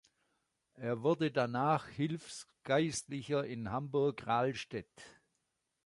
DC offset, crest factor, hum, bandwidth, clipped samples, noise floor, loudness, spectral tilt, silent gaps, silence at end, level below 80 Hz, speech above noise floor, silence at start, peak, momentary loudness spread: under 0.1%; 18 dB; none; 11.5 kHz; under 0.1%; -84 dBFS; -35 LUFS; -5.5 dB/octave; none; 0.75 s; -70 dBFS; 49 dB; 0.75 s; -18 dBFS; 12 LU